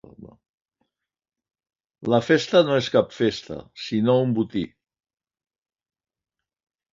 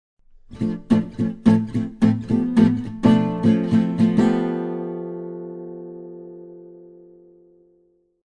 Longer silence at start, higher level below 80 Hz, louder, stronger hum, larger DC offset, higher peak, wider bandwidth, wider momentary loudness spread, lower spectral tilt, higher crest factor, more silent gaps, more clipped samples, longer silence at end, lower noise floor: second, 0.2 s vs 0.5 s; second, -60 dBFS vs -50 dBFS; about the same, -21 LUFS vs -20 LUFS; neither; neither; about the same, -4 dBFS vs -2 dBFS; second, 7.6 kHz vs 9.2 kHz; second, 15 LU vs 19 LU; second, -6 dB/octave vs -8.5 dB/octave; about the same, 22 dB vs 20 dB; first, 0.49-0.58 s vs none; neither; first, 2.25 s vs 1.45 s; first, -88 dBFS vs -62 dBFS